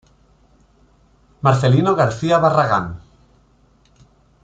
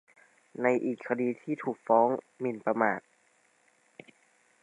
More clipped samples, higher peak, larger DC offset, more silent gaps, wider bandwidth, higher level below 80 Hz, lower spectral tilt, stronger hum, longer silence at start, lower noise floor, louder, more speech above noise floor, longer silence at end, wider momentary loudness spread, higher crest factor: neither; first, -2 dBFS vs -10 dBFS; neither; neither; second, 8.8 kHz vs 10.5 kHz; first, -50 dBFS vs -84 dBFS; about the same, -7 dB/octave vs -8 dB/octave; neither; first, 1.45 s vs 0.6 s; second, -55 dBFS vs -68 dBFS; first, -16 LUFS vs -30 LUFS; about the same, 40 dB vs 39 dB; second, 1.45 s vs 1.65 s; about the same, 9 LU vs 10 LU; about the same, 18 dB vs 22 dB